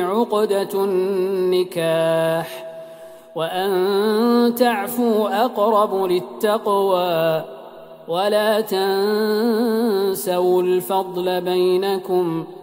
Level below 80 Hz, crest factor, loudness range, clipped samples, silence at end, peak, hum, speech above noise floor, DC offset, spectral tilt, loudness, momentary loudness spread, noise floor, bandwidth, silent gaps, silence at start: -70 dBFS; 16 dB; 2 LU; under 0.1%; 0 s; -4 dBFS; none; 21 dB; under 0.1%; -5.5 dB/octave; -19 LUFS; 8 LU; -40 dBFS; 16.5 kHz; none; 0 s